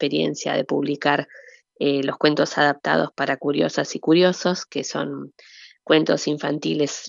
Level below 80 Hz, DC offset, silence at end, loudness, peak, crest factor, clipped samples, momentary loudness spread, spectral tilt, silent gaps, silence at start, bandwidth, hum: -78 dBFS; under 0.1%; 0 s; -21 LUFS; -2 dBFS; 20 dB; under 0.1%; 9 LU; -4.5 dB/octave; none; 0 s; 7.6 kHz; none